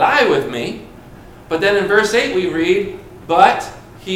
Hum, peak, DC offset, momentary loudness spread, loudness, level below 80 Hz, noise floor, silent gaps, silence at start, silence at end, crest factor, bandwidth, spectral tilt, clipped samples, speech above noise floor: none; 0 dBFS; under 0.1%; 18 LU; -15 LUFS; -46 dBFS; -38 dBFS; none; 0 s; 0 s; 16 dB; 16 kHz; -4 dB/octave; under 0.1%; 23 dB